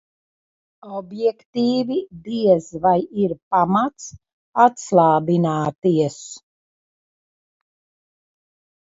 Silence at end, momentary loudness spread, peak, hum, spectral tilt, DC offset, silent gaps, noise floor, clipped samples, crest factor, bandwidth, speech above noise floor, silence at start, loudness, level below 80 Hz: 2.55 s; 17 LU; 0 dBFS; none; -6.5 dB/octave; under 0.1%; 1.45-1.53 s, 3.42-3.51 s, 4.33-4.53 s, 5.78-5.82 s; under -90 dBFS; under 0.1%; 20 dB; 7.8 kHz; over 71 dB; 0.85 s; -19 LUFS; -62 dBFS